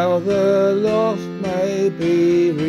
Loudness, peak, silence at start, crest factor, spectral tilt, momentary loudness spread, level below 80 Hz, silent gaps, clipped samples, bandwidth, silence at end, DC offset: -18 LUFS; -8 dBFS; 0 s; 10 dB; -7 dB/octave; 6 LU; -54 dBFS; none; under 0.1%; 12 kHz; 0 s; under 0.1%